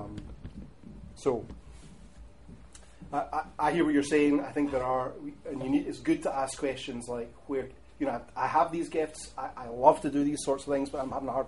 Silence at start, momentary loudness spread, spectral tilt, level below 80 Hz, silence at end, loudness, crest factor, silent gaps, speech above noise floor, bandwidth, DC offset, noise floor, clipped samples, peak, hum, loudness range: 0 s; 20 LU; -5.5 dB/octave; -54 dBFS; 0 s; -30 LUFS; 24 dB; none; 22 dB; 11.5 kHz; 0.2%; -52 dBFS; under 0.1%; -6 dBFS; none; 6 LU